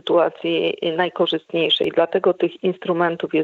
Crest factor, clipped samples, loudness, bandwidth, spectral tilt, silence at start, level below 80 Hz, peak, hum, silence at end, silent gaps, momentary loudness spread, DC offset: 16 dB; under 0.1%; -20 LUFS; 7.2 kHz; -7 dB/octave; 0.05 s; -70 dBFS; -4 dBFS; none; 0 s; none; 4 LU; under 0.1%